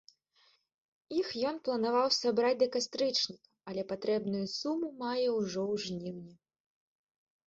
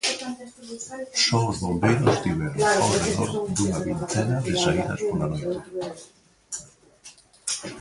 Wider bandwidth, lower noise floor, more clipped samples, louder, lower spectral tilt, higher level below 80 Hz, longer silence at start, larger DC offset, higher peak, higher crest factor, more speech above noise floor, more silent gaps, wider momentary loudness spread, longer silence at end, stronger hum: second, 7.8 kHz vs 11.5 kHz; first, -70 dBFS vs -50 dBFS; neither; second, -33 LUFS vs -24 LUFS; about the same, -4 dB/octave vs -4.5 dB/octave; second, -74 dBFS vs -48 dBFS; first, 1.1 s vs 0.05 s; neither; second, -16 dBFS vs -6 dBFS; about the same, 18 dB vs 18 dB; first, 37 dB vs 26 dB; neither; second, 11 LU vs 15 LU; first, 1.1 s vs 0 s; neither